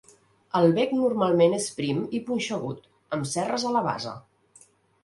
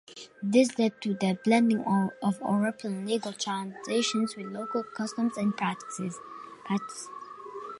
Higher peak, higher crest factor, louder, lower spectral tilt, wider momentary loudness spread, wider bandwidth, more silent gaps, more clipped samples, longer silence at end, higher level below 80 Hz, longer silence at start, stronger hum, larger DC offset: about the same, -8 dBFS vs -10 dBFS; about the same, 18 dB vs 20 dB; first, -25 LUFS vs -29 LUFS; about the same, -5.5 dB/octave vs -5 dB/octave; second, 13 LU vs 17 LU; about the same, 11.5 kHz vs 11.5 kHz; neither; neither; first, 0.85 s vs 0 s; first, -66 dBFS vs -76 dBFS; first, 0.55 s vs 0.1 s; neither; neither